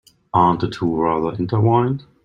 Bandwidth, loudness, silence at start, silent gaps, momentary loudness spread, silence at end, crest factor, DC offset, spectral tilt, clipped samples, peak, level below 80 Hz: 7.6 kHz; -19 LUFS; 0.35 s; none; 5 LU; 0.25 s; 16 dB; under 0.1%; -9 dB/octave; under 0.1%; -2 dBFS; -50 dBFS